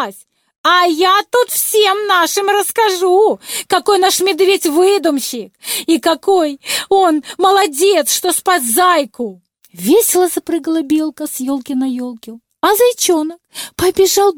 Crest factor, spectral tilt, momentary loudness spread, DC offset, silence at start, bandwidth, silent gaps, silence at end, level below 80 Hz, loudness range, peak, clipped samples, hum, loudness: 12 dB; -1.5 dB/octave; 10 LU; under 0.1%; 0 s; over 20 kHz; 0.58-0.64 s; 0 s; -54 dBFS; 4 LU; -2 dBFS; under 0.1%; none; -13 LUFS